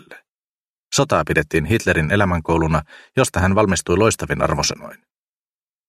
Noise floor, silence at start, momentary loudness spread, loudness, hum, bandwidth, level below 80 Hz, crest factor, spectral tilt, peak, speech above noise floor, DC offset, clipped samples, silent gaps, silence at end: under -90 dBFS; 0.1 s; 5 LU; -18 LUFS; none; 15.5 kHz; -38 dBFS; 20 dB; -4.5 dB/octave; 0 dBFS; over 72 dB; under 0.1%; under 0.1%; 0.29-0.91 s; 0.95 s